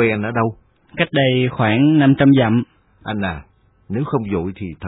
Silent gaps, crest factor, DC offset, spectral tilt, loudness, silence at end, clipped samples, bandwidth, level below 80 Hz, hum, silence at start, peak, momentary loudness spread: none; 16 dB; under 0.1%; -11 dB/octave; -17 LUFS; 0 s; under 0.1%; 4 kHz; -46 dBFS; none; 0 s; -2 dBFS; 15 LU